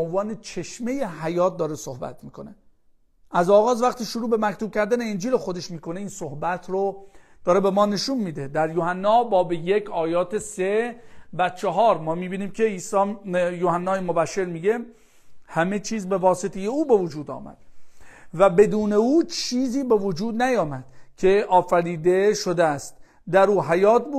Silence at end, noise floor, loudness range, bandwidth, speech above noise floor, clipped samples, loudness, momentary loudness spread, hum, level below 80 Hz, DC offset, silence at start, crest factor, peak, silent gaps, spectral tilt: 0 s; -58 dBFS; 4 LU; 14 kHz; 36 dB; under 0.1%; -22 LUFS; 13 LU; none; -54 dBFS; under 0.1%; 0 s; 20 dB; -4 dBFS; none; -5.5 dB/octave